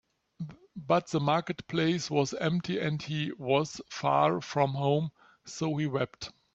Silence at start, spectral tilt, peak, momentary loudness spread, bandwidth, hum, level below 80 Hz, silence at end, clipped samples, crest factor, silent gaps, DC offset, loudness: 0.4 s; -6 dB/octave; -12 dBFS; 15 LU; 8 kHz; none; -68 dBFS; 0.25 s; under 0.1%; 18 dB; none; under 0.1%; -30 LUFS